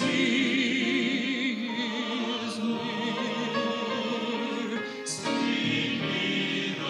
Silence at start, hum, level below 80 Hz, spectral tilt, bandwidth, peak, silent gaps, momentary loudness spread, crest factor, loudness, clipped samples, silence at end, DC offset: 0 s; none; -76 dBFS; -4 dB/octave; 12 kHz; -14 dBFS; none; 6 LU; 14 dB; -28 LUFS; under 0.1%; 0 s; under 0.1%